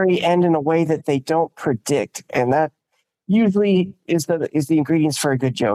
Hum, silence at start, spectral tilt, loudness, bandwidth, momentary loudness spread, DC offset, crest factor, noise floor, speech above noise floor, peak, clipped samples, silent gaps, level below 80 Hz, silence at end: none; 0 s; -6 dB/octave; -19 LUFS; 14.5 kHz; 6 LU; under 0.1%; 12 dB; -71 dBFS; 53 dB; -6 dBFS; under 0.1%; none; -62 dBFS; 0 s